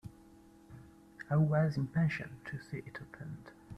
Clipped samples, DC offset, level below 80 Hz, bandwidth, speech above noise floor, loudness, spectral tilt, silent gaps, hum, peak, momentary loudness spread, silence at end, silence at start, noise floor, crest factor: under 0.1%; under 0.1%; -64 dBFS; 8.4 kHz; 25 dB; -34 LUFS; -8.5 dB/octave; none; none; -18 dBFS; 25 LU; 0 s; 0.05 s; -59 dBFS; 18 dB